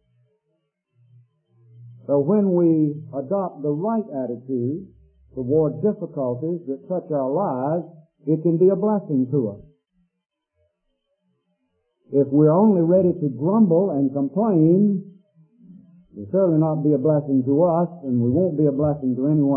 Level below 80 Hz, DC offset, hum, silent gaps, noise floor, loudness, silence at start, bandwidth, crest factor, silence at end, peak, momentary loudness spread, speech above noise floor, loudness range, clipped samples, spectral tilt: -62 dBFS; under 0.1%; none; none; -74 dBFS; -21 LUFS; 1.8 s; 2.6 kHz; 16 dB; 0 s; -6 dBFS; 11 LU; 54 dB; 6 LU; under 0.1%; -16.5 dB/octave